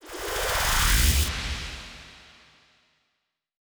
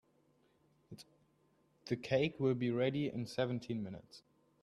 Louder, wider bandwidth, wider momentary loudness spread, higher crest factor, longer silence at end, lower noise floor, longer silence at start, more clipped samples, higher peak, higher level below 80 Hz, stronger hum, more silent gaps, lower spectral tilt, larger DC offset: first, -24 LUFS vs -37 LUFS; first, over 20 kHz vs 12.5 kHz; second, 19 LU vs 22 LU; about the same, 18 dB vs 20 dB; first, 1.55 s vs 0.45 s; first, -79 dBFS vs -74 dBFS; second, 0.05 s vs 0.9 s; neither; first, -10 dBFS vs -20 dBFS; first, -32 dBFS vs -72 dBFS; neither; neither; second, -2.5 dB/octave vs -7 dB/octave; neither